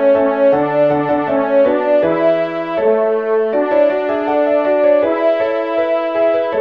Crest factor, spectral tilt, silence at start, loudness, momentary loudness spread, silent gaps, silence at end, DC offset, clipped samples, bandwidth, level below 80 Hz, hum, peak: 12 dB; -8 dB/octave; 0 s; -14 LUFS; 4 LU; none; 0 s; 0.2%; under 0.1%; 5.2 kHz; -56 dBFS; none; -2 dBFS